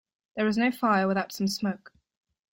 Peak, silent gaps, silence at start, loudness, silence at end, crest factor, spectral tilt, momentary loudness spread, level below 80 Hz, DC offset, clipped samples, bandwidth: -12 dBFS; none; 0.35 s; -27 LUFS; 0.75 s; 16 dB; -5.5 dB/octave; 11 LU; -68 dBFS; under 0.1%; under 0.1%; 16.5 kHz